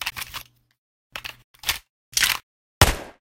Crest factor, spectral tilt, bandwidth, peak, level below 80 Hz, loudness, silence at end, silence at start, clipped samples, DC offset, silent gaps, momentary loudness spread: 26 dB; -2 dB/octave; 16.5 kHz; -2 dBFS; -36 dBFS; -23 LUFS; 0.1 s; 0 s; under 0.1%; under 0.1%; 0.78-1.10 s, 1.44-1.54 s, 1.90-2.12 s, 2.43-2.81 s; 17 LU